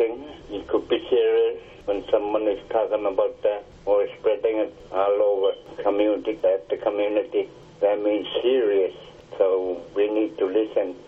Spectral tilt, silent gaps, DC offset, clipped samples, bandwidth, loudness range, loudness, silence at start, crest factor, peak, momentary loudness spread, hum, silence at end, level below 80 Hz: -6.5 dB/octave; none; under 0.1%; under 0.1%; 5.8 kHz; 1 LU; -24 LUFS; 0 s; 16 dB; -8 dBFS; 8 LU; none; 0 s; -56 dBFS